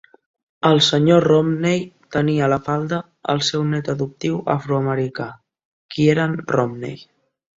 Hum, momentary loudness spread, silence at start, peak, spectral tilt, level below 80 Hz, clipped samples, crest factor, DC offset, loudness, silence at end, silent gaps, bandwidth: none; 12 LU; 0.65 s; -2 dBFS; -6 dB/octave; -56 dBFS; under 0.1%; 18 dB; under 0.1%; -19 LUFS; 0.55 s; 5.65-5.89 s; 7.8 kHz